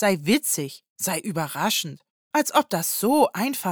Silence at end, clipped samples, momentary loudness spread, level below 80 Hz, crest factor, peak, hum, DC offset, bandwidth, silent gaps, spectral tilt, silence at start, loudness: 0 s; under 0.1%; 8 LU; -70 dBFS; 18 dB; -6 dBFS; none; under 0.1%; over 20 kHz; 0.89-0.96 s, 2.10-2.31 s; -3.5 dB/octave; 0 s; -23 LUFS